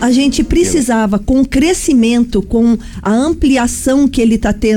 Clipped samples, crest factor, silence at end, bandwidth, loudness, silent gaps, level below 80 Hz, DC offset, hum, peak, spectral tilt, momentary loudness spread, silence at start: under 0.1%; 8 dB; 0 s; 17.5 kHz; -12 LUFS; none; -26 dBFS; under 0.1%; none; -4 dBFS; -5 dB/octave; 3 LU; 0 s